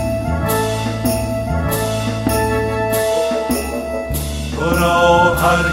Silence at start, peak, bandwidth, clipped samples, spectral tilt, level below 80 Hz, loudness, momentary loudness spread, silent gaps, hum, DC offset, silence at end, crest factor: 0 s; -2 dBFS; 16.5 kHz; under 0.1%; -5 dB/octave; -28 dBFS; -17 LUFS; 10 LU; none; none; under 0.1%; 0 s; 16 dB